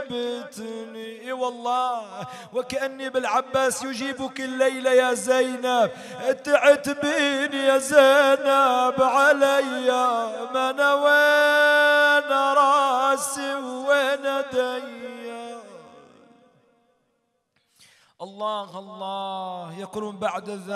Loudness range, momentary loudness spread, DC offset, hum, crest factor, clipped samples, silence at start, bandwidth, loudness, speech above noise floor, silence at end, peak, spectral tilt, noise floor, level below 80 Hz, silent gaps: 16 LU; 18 LU; under 0.1%; none; 20 dB; under 0.1%; 0 s; 14.5 kHz; -21 LUFS; 50 dB; 0 s; -2 dBFS; -2.5 dB/octave; -72 dBFS; -70 dBFS; none